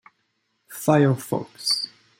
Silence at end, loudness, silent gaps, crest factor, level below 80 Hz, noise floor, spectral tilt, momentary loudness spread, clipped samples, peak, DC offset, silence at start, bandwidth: 0.35 s; -22 LUFS; none; 20 dB; -66 dBFS; -72 dBFS; -5 dB/octave; 10 LU; under 0.1%; -4 dBFS; under 0.1%; 0.7 s; 16.5 kHz